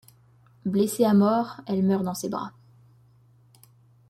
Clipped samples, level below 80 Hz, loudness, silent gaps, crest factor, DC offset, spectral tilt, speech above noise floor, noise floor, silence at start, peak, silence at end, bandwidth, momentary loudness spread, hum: under 0.1%; -68 dBFS; -24 LUFS; none; 18 dB; under 0.1%; -6.5 dB/octave; 34 dB; -58 dBFS; 0.65 s; -8 dBFS; 1.6 s; 14 kHz; 14 LU; none